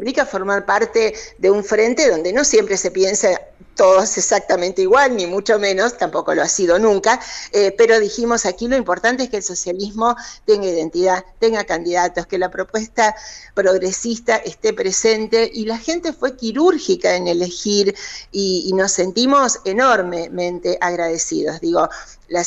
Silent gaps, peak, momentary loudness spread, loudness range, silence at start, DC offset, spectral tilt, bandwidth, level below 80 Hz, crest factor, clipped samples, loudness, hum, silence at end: none; -4 dBFS; 8 LU; 3 LU; 0 s; under 0.1%; -2.5 dB/octave; 8.4 kHz; -48 dBFS; 14 dB; under 0.1%; -17 LUFS; none; 0 s